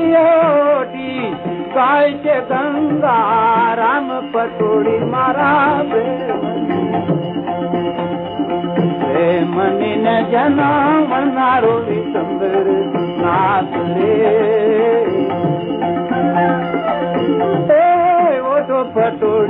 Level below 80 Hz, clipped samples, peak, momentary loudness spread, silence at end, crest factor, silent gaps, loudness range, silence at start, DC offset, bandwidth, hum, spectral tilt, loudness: -54 dBFS; under 0.1%; -2 dBFS; 7 LU; 0 s; 12 dB; none; 3 LU; 0 s; under 0.1%; 4.2 kHz; none; -10.5 dB/octave; -15 LUFS